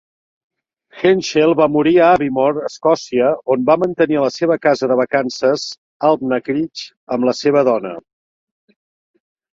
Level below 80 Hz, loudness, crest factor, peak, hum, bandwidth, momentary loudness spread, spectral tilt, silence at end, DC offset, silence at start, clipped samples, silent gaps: -58 dBFS; -16 LUFS; 16 dB; -2 dBFS; none; 7.8 kHz; 9 LU; -5.5 dB/octave; 1.55 s; under 0.1%; 0.95 s; under 0.1%; 5.78-6.00 s, 6.97-7.07 s